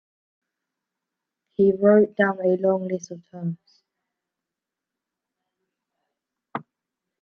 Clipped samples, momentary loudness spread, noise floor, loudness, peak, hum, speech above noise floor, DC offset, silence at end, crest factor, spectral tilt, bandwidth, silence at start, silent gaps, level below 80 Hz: under 0.1%; 19 LU; -87 dBFS; -21 LUFS; -6 dBFS; none; 66 dB; under 0.1%; 0.6 s; 22 dB; -7.5 dB/octave; 6.6 kHz; 1.6 s; none; -70 dBFS